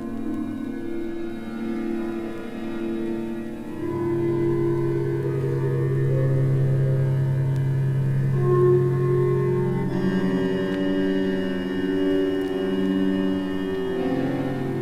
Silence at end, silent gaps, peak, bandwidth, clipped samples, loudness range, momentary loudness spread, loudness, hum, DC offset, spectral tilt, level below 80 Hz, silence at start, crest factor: 0 s; none; -8 dBFS; 9.6 kHz; under 0.1%; 7 LU; 9 LU; -24 LUFS; none; under 0.1%; -9 dB/octave; -48 dBFS; 0 s; 14 dB